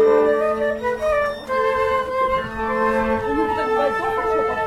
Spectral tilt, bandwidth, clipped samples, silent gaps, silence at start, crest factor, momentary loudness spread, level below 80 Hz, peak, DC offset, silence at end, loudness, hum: -5.5 dB/octave; 13.5 kHz; under 0.1%; none; 0 s; 14 dB; 3 LU; -42 dBFS; -6 dBFS; under 0.1%; 0 s; -20 LUFS; none